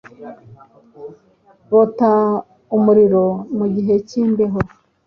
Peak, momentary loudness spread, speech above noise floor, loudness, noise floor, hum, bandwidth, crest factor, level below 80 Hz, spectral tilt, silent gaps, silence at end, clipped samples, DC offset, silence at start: -2 dBFS; 25 LU; 37 dB; -16 LUFS; -53 dBFS; none; 6.8 kHz; 14 dB; -50 dBFS; -9 dB/octave; none; 0.4 s; under 0.1%; under 0.1%; 0.2 s